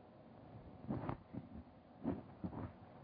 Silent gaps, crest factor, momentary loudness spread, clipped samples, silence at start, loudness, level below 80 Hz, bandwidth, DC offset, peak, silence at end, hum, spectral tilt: none; 22 dB; 14 LU; under 0.1%; 0 s; -49 LUFS; -64 dBFS; 4.9 kHz; under 0.1%; -28 dBFS; 0 s; none; -8.5 dB/octave